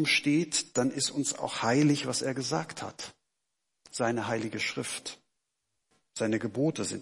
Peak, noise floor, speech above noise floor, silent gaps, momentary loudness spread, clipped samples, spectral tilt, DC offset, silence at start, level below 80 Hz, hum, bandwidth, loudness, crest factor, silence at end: -12 dBFS; -84 dBFS; 54 dB; none; 14 LU; under 0.1%; -4 dB/octave; under 0.1%; 0 s; -74 dBFS; none; 11.5 kHz; -30 LUFS; 18 dB; 0 s